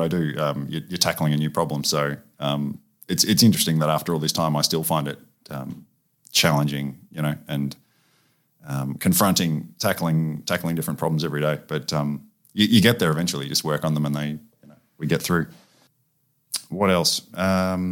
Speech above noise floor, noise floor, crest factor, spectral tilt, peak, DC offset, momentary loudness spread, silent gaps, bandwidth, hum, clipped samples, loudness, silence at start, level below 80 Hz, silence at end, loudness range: 46 dB; -68 dBFS; 22 dB; -4.5 dB/octave; -2 dBFS; under 0.1%; 14 LU; none; 18 kHz; none; under 0.1%; -22 LUFS; 0 s; -56 dBFS; 0 s; 4 LU